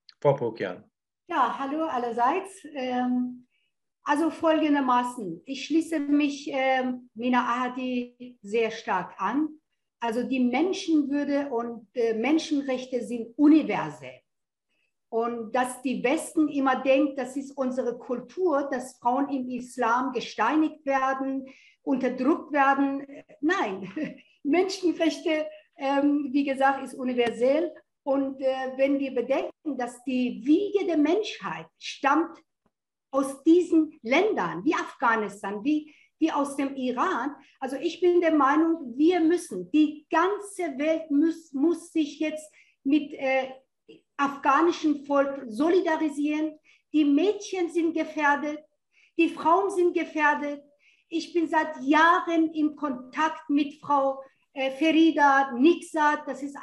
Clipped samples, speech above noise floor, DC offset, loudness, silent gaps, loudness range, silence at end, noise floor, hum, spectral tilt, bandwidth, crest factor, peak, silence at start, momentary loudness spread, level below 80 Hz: under 0.1%; 57 dB; under 0.1%; -26 LUFS; none; 4 LU; 0 s; -82 dBFS; none; -5 dB/octave; 12 kHz; 18 dB; -8 dBFS; 0.25 s; 12 LU; -76 dBFS